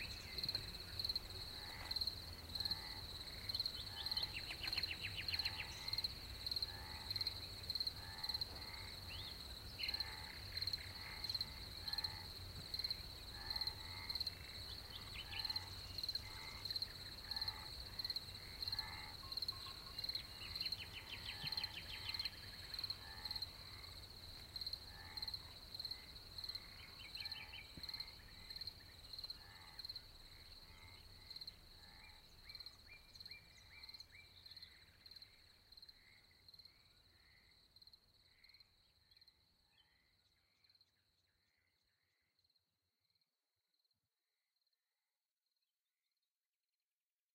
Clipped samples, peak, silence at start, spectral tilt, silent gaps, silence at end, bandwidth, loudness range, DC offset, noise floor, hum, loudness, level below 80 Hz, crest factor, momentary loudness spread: under 0.1%; -28 dBFS; 0 s; -2 dB/octave; none; 6.5 s; 16 kHz; 15 LU; under 0.1%; under -90 dBFS; none; -46 LUFS; -62 dBFS; 22 dB; 17 LU